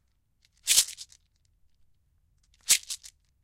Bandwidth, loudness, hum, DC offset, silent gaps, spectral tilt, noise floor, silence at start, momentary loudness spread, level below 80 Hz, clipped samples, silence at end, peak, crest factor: 16 kHz; -24 LUFS; none; under 0.1%; none; 4 dB/octave; -69 dBFS; 0.65 s; 19 LU; -66 dBFS; under 0.1%; 0.45 s; -4 dBFS; 28 dB